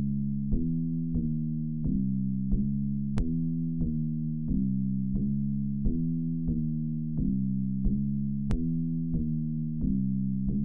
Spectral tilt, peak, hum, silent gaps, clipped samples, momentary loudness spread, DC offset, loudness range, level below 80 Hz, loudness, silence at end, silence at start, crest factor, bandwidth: -11.5 dB/octave; -16 dBFS; none; none; under 0.1%; 2 LU; 1%; 0 LU; -38 dBFS; -30 LUFS; 0 s; 0 s; 14 dB; 2.5 kHz